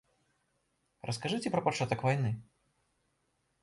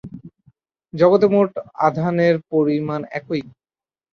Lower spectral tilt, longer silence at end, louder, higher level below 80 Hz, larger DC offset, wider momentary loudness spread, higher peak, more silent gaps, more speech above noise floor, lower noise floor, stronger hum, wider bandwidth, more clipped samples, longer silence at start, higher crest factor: second, -5.5 dB/octave vs -8.5 dB/octave; first, 1.2 s vs 0.65 s; second, -33 LUFS vs -19 LUFS; second, -68 dBFS vs -60 dBFS; neither; second, 10 LU vs 13 LU; second, -14 dBFS vs -2 dBFS; neither; second, 45 dB vs over 72 dB; second, -78 dBFS vs under -90 dBFS; neither; first, 11.5 kHz vs 6.6 kHz; neither; first, 1.05 s vs 0.05 s; about the same, 22 dB vs 18 dB